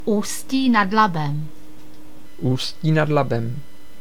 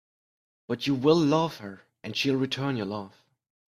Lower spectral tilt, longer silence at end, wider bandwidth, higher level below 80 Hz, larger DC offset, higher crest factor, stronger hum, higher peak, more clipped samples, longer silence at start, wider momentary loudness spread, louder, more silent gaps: about the same, -5.5 dB/octave vs -6 dB/octave; second, 0.4 s vs 0.6 s; first, 18 kHz vs 14.5 kHz; first, -54 dBFS vs -68 dBFS; first, 4% vs under 0.1%; about the same, 18 dB vs 20 dB; neither; first, -2 dBFS vs -8 dBFS; neither; second, 0 s vs 0.7 s; second, 13 LU vs 20 LU; first, -21 LUFS vs -27 LUFS; neither